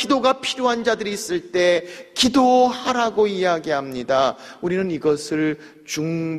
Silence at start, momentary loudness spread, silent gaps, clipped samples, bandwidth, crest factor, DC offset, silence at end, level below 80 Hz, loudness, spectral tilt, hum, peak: 0 s; 9 LU; none; under 0.1%; 14.5 kHz; 16 dB; under 0.1%; 0 s; -56 dBFS; -20 LUFS; -4 dB/octave; none; -4 dBFS